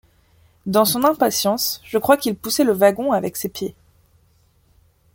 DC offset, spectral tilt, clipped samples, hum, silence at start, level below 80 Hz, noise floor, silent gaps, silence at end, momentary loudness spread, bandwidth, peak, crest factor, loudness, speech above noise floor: under 0.1%; -3.5 dB/octave; under 0.1%; none; 0.65 s; -58 dBFS; -58 dBFS; none; 1.45 s; 11 LU; 17 kHz; -2 dBFS; 20 dB; -19 LUFS; 40 dB